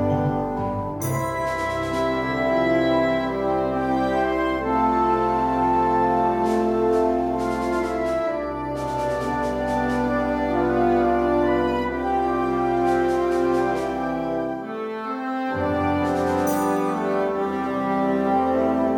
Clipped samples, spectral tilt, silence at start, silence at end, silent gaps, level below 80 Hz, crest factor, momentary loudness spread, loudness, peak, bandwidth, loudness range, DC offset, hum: under 0.1%; -6.5 dB/octave; 0 s; 0 s; none; -42 dBFS; 12 dB; 6 LU; -22 LUFS; -10 dBFS; 16.5 kHz; 3 LU; under 0.1%; none